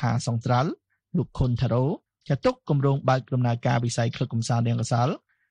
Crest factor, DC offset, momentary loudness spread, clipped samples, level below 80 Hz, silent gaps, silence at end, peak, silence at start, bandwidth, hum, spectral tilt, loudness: 16 dB; under 0.1%; 6 LU; under 0.1%; -46 dBFS; none; 0.35 s; -8 dBFS; 0 s; 10.5 kHz; none; -6.5 dB/octave; -25 LUFS